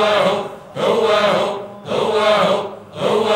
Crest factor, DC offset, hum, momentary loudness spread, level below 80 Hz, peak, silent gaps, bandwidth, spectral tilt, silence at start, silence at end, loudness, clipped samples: 14 dB; under 0.1%; none; 10 LU; -58 dBFS; -4 dBFS; none; 16 kHz; -4.5 dB/octave; 0 s; 0 s; -17 LUFS; under 0.1%